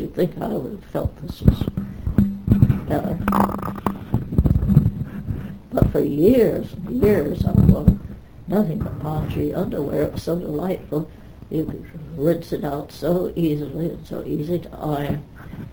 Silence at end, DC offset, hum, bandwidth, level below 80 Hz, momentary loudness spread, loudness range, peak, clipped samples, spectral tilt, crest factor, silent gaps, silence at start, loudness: 0 s; under 0.1%; none; over 20 kHz; -32 dBFS; 12 LU; 6 LU; 0 dBFS; under 0.1%; -9 dB/octave; 20 dB; none; 0 s; -22 LUFS